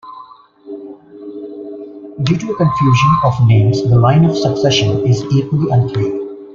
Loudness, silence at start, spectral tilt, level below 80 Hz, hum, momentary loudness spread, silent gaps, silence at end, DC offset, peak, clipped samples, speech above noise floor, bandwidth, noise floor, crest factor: -13 LUFS; 0.05 s; -7 dB/octave; -42 dBFS; none; 20 LU; none; 0 s; under 0.1%; -2 dBFS; under 0.1%; 27 dB; 7.4 kHz; -39 dBFS; 12 dB